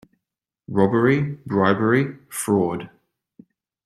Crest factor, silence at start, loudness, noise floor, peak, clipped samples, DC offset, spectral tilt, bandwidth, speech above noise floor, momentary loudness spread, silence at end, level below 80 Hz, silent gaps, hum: 20 dB; 0.7 s; -21 LUFS; -84 dBFS; -2 dBFS; under 0.1%; under 0.1%; -6.5 dB/octave; 15.5 kHz; 64 dB; 10 LU; 1 s; -60 dBFS; none; none